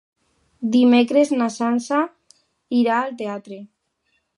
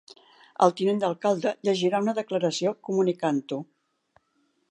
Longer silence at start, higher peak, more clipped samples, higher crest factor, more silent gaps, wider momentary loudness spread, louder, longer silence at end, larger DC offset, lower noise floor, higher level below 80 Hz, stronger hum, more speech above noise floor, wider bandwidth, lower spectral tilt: about the same, 0.6 s vs 0.6 s; about the same, -4 dBFS vs -4 dBFS; neither; about the same, 18 dB vs 22 dB; neither; first, 15 LU vs 6 LU; first, -19 LUFS vs -26 LUFS; second, 0.75 s vs 1.1 s; neither; about the same, -70 dBFS vs -71 dBFS; about the same, -74 dBFS vs -78 dBFS; neither; first, 51 dB vs 46 dB; about the same, 11 kHz vs 10 kHz; about the same, -5 dB/octave vs -5.5 dB/octave